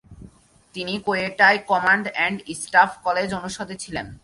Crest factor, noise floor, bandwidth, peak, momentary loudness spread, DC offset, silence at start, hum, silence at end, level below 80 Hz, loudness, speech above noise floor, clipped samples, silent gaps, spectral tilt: 20 dB; -49 dBFS; 11.5 kHz; -2 dBFS; 14 LU; under 0.1%; 0.1 s; none; 0.05 s; -54 dBFS; -21 LUFS; 27 dB; under 0.1%; none; -3.5 dB/octave